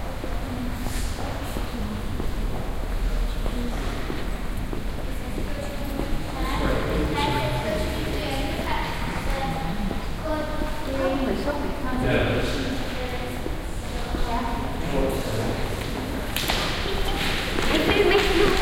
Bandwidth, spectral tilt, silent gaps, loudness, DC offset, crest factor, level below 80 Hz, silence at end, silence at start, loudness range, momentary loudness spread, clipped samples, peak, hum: 16.5 kHz; -5 dB/octave; none; -27 LUFS; under 0.1%; 20 dB; -30 dBFS; 0 s; 0 s; 5 LU; 9 LU; under 0.1%; -6 dBFS; none